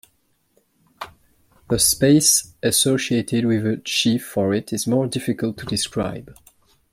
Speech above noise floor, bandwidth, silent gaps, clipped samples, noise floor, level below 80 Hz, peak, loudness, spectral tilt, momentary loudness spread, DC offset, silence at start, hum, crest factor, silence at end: 45 dB; 16.5 kHz; none; under 0.1%; -65 dBFS; -50 dBFS; -2 dBFS; -19 LUFS; -3.5 dB/octave; 14 LU; under 0.1%; 1 s; none; 18 dB; 0.6 s